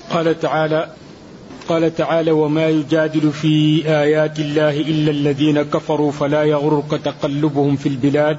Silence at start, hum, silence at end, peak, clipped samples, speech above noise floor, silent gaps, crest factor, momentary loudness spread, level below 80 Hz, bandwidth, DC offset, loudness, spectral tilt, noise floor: 0 s; none; 0 s; -4 dBFS; under 0.1%; 21 dB; none; 12 dB; 5 LU; -54 dBFS; 8 kHz; under 0.1%; -17 LUFS; -7 dB/octave; -37 dBFS